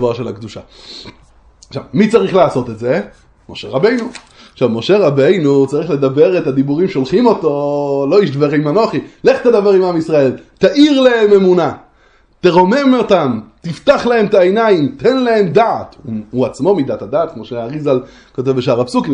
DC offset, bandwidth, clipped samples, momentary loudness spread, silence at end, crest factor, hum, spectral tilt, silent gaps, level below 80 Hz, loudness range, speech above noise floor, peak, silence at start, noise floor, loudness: under 0.1%; 9.8 kHz; under 0.1%; 15 LU; 0 s; 12 dB; none; -7 dB/octave; none; -50 dBFS; 5 LU; 37 dB; 0 dBFS; 0 s; -50 dBFS; -13 LUFS